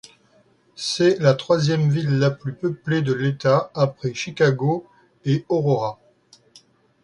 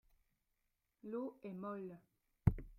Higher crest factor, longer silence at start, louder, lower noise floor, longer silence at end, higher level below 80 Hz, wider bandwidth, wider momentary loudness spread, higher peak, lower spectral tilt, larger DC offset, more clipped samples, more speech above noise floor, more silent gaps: second, 20 dB vs 30 dB; second, 0.8 s vs 1.05 s; first, -21 LUFS vs -44 LUFS; second, -58 dBFS vs -86 dBFS; first, 1.1 s vs 0 s; second, -60 dBFS vs -52 dBFS; second, 11 kHz vs 14.5 kHz; second, 9 LU vs 17 LU; first, -2 dBFS vs -14 dBFS; second, -6.5 dB/octave vs -11 dB/octave; neither; neither; about the same, 38 dB vs 39 dB; neither